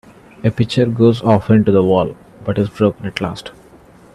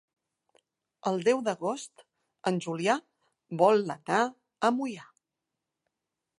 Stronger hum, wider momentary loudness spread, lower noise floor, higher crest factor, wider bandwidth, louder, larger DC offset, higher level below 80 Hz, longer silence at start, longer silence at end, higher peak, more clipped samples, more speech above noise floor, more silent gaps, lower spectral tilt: neither; about the same, 12 LU vs 14 LU; second, -44 dBFS vs -87 dBFS; second, 16 dB vs 22 dB; about the same, 11.5 kHz vs 11.5 kHz; first, -15 LUFS vs -29 LUFS; neither; first, -48 dBFS vs -82 dBFS; second, 0.45 s vs 1.05 s; second, 0.65 s vs 1.35 s; first, 0 dBFS vs -10 dBFS; neither; second, 29 dB vs 59 dB; neither; first, -8 dB/octave vs -5 dB/octave